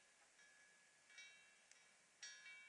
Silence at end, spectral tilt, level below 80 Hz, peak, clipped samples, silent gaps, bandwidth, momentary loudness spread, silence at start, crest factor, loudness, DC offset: 0 s; 2 dB/octave; under -90 dBFS; -42 dBFS; under 0.1%; none; 11 kHz; 12 LU; 0 s; 22 dB; -63 LUFS; under 0.1%